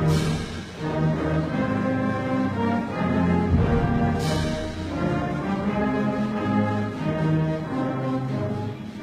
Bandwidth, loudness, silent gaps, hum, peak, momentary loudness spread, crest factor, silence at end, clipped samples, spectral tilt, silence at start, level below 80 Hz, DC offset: 13 kHz; -25 LUFS; none; none; -10 dBFS; 6 LU; 14 dB; 0 s; under 0.1%; -7.5 dB/octave; 0 s; -38 dBFS; under 0.1%